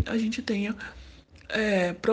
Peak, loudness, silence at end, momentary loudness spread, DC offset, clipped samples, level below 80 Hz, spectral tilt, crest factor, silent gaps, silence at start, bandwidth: -12 dBFS; -28 LUFS; 0 s; 15 LU; under 0.1%; under 0.1%; -52 dBFS; -5.5 dB/octave; 16 dB; none; 0 s; 9.4 kHz